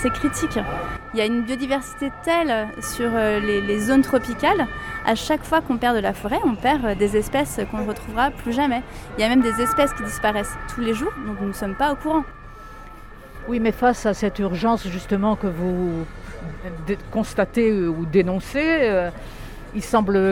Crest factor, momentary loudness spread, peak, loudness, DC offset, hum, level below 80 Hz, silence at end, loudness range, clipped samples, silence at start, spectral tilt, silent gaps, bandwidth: 18 dB; 13 LU; -4 dBFS; -22 LUFS; under 0.1%; none; -38 dBFS; 0 s; 3 LU; under 0.1%; 0 s; -5.5 dB/octave; none; 17.5 kHz